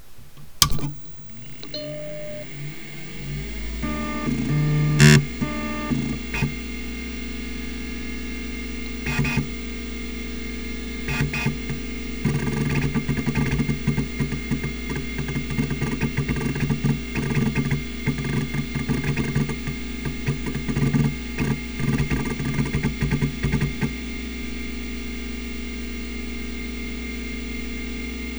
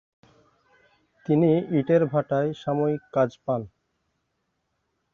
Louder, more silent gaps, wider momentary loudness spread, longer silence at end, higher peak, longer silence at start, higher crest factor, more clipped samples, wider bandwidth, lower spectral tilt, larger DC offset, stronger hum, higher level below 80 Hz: about the same, -25 LUFS vs -24 LUFS; neither; about the same, 9 LU vs 9 LU; second, 0 s vs 1.45 s; first, 0 dBFS vs -8 dBFS; second, 0 s vs 1.3 s; first, 26 dB vs 18 dB; neither; first, over 20 kHz vs 7 kHz; second, -5 dB/octave vs -9.5 dB/octave; first, 1% vs under 0.1%; neither; first, -34 dBFS vs -66 dBFS